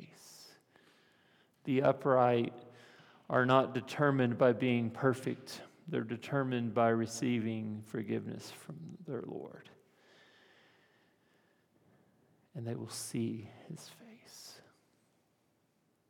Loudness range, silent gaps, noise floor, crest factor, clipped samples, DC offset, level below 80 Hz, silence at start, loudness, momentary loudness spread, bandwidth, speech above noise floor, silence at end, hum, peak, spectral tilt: 18 LU; none; -75 dBFS; 24 dB; under 0.1%; under 0.1%; -84 dBFS; 0 s; -33 LUFS; 22 LU; 17.5 kHz; 42 dB; 1.5 s; none; -12 dBFS; -6 dB/octave